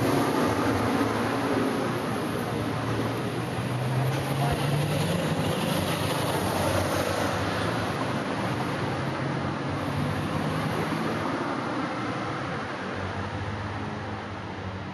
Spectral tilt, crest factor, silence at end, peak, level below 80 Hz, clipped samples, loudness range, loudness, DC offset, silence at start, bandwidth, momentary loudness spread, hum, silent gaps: -5.5 dB/octave; 14 dB; 0 s; -12 dBFS; -54 dBFS; under 0.1%; 4 LU; -28 LUFS; under 0.1%; 0 s; 13 kHz; 7 LU; none; none